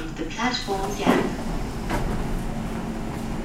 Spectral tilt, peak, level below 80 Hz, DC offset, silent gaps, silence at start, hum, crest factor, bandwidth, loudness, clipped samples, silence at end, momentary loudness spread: -5 dB/octave; -4 dBFS; -32 dBFS; 0.2%; none; 0 s; none; 20 dB; 16 kHz; -27 LUFS; under 0.1%; 0 s; 9 LU